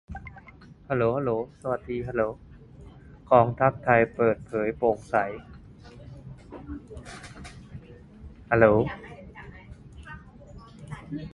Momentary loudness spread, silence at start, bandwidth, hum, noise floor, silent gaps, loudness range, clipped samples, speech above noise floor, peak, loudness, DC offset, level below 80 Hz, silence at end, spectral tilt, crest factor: 25 LU; 0.1 s; 11.5 kHz; none; -50 dBFS; none; 8 LU; under 0.1%; 25 dB; -4 dBFS; -25 LUFS; under 0.1%; -50 dBFS; 0.05 s; -8 dB/octave; 24 dB